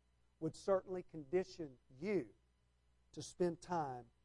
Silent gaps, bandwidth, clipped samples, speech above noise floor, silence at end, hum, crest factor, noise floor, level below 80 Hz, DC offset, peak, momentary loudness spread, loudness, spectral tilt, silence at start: none; 11.5 kHz; under 0.1%; 34 dB; 0.2 s; 60 Hz at -70 dBFS; 20 dB; -76 dBFS; -72 dBFS; under 0.1%; -24 dBFS; 13 LU; -43 LUFS; -6.5 dB/octave; 0.4 s